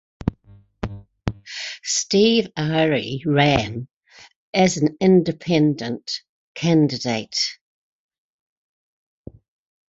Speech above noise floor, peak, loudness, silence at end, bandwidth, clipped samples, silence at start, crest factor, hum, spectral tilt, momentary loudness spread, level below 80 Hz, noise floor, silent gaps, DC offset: 32 dB; -2 dBFS; -20 LUFS; 2.4 s; 8 kHz; under 0.1%; 0.25 s; 20 dB; none; -5 dB/octave; 14 LU; -46 dBFS; -51 dBFS; 3.96-4.01 s, 4.36-4.53 s, 6.29-6.55 s; under 0.1%